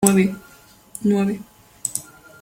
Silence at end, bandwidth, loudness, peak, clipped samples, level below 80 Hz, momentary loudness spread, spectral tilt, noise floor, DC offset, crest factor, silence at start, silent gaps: 0.4 s; 17 kHz; -22 LUFS; 0 dBFS; under 0.1%; -56 dBFS; 19 LU; -5 dB/octave; -49 dBFS; under 0.1%; 22 dB; 0 s; none